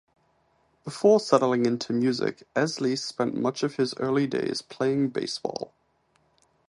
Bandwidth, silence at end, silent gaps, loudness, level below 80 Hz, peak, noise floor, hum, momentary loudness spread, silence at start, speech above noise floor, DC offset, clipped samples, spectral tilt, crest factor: 11.5 kHz; 1 s; none; -26 LUFS; -70 dBFS; -4 dBFS; -68 dBFS; none; 10 LU; 0.85 s; 43 dB; under 0.1%; under 0.1%; -5.5 dB/octave; 22 dB